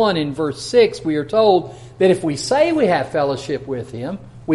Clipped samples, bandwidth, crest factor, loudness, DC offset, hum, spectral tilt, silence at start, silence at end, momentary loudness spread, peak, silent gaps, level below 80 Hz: under 0.1%; 11.5 kHz; 16 dB; -18 LUFS; under 0.1%; none; -5.5 dB/octave; 0 s; 0 s; 13 LU; -2 dBFS; none; -50 dBFS